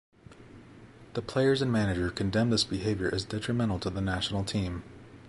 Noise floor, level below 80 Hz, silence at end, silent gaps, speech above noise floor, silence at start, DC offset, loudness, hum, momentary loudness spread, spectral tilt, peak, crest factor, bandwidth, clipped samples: -51 dBFS; -48 dBFS; 0 s; none; 22 dB; 0.3 s; under 0.1%; -29 LUFS; none; 10 LU; -5.5 dB/octave; -14 dBFS; 16 dB; 11.5 kHz; under 0.1%